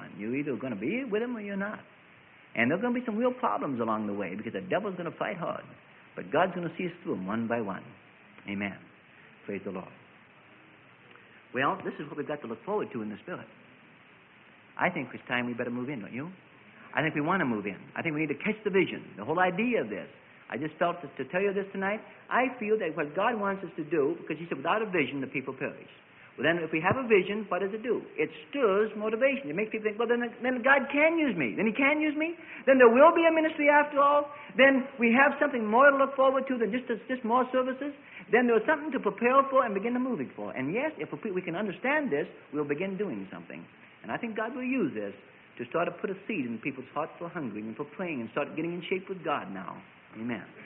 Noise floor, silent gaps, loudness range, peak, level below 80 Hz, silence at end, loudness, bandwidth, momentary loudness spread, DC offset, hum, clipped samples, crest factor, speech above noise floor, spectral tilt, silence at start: -56 dBFS; none; 12 LU; -8 dBFS; -72 dBFS; 0 s; -29 LUFS; 3.9 kHz; 15 LU; under 0.1%; none; under 0.1%; 22 dB; 28 dB; -10 dB/octave; 0 s